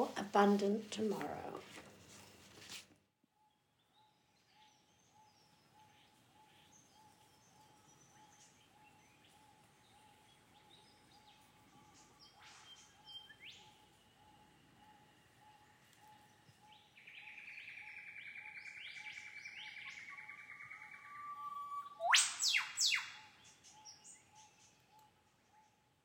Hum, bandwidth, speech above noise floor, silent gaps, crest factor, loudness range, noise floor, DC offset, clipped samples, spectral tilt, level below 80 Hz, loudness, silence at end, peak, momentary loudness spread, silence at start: none; 18.5 kHz; 43 dB; none; 28 dB; 25 LU; -77 dBFS; under 0.1%; under 0.1%; -2 dB/octave; -86 dBFS; -39 LUFS; 1.05 s; -16 dBFS; 27 LU; 0 s